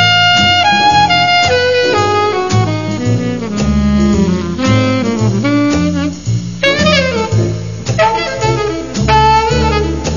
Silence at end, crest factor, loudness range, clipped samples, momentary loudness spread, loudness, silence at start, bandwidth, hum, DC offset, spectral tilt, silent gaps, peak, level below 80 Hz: 0 s; 12 dB; 3 LU; under 0.1%; 8 LU; -12 LUFS; 0 s; 7.4 kHz; none; 1%; -5 dB/octave; none; 0 dBFS; -26 dBFS